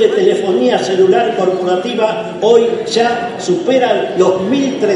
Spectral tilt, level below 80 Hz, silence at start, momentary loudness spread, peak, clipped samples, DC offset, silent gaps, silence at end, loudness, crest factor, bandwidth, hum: -5 dB/octave; -60 dBFS; 0 s; 5 LU; 0 dBFS; under 0.1%; under 0.1%; none; 0 s; -13 LUFS; 12 dB; 10.5 kHz; none